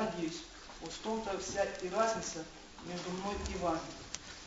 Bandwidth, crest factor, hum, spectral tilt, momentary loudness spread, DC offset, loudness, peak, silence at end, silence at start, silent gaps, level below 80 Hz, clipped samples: 8 kHz; 22 dB; none; -4 dB/octave; 12 LU; under 0.1%; -38 LUFS; -16 dBFS; 0 s; 0 s; none; -54 dBFS; under 0.1%